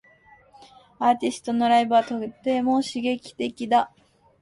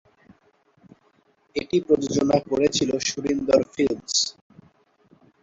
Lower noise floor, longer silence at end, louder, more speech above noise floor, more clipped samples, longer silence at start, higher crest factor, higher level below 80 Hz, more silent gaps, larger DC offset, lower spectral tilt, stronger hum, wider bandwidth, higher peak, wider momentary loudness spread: second, -55 dBFS vs -63 dBFS; second, 0.55 s vs 1.1 s; about the same, -23 LUFS vs -23 LUFS; second, 32 dB vs 41 dB; neither; second, 1 s vs 1.55 s; about the same, 16 dB vs 20 dB; second, -66 dBFS vs -56 dBFS; neither; neither; about the same, -4.5 dB/octave vs -4 dB/octave; neither; first, 11.5 kHz vs 8 kHz; about the same, -8 dBFS vs -6 dBFS; first, 11 LU vs 5 LU